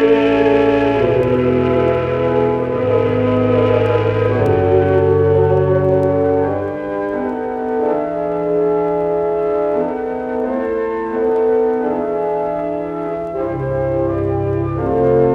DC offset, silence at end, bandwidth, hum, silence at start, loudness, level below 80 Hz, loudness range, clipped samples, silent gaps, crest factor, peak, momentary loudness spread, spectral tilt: under 0.1%; 0 s; 5.8 kHz; none; 0 s; -16 LUFS; -40 dBFS; 4 LU; under 0.1%; none; 14 dB; -2 dBFS; 8 LU; -9.5 dB/octave